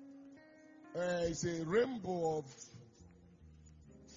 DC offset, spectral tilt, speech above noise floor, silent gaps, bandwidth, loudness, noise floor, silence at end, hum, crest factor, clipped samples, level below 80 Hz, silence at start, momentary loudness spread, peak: under 0.1%; -5.5 dB/octave; 24 dB; none; 7.4 kHz; -37 LUFS; -61 dBFS; 0 s; none; 20 dB; under 0.1%; -66 dBFS; 0 s; 25 LU; -22 dBFS